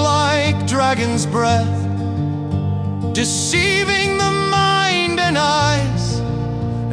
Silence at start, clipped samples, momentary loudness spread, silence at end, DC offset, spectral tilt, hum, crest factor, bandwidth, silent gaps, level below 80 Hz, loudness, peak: 0 s; under 0.1%; 7 LU; 0 s; under 0.1%; -4.5 dB/octave; none; 14 dB; 10.5 kHz; none; -38 dBFS; -17 LUFS; -4 dBFS